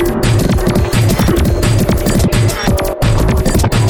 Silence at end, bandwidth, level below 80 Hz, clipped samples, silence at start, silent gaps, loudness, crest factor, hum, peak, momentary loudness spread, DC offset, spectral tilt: 0 s; over 20 kHz; -18 dBFS; under 0.1%; 0 s; none; -13 LUFS; 10 dB; none; 0 dBFS; 2 LU; under 0.1%; -6 dB/octave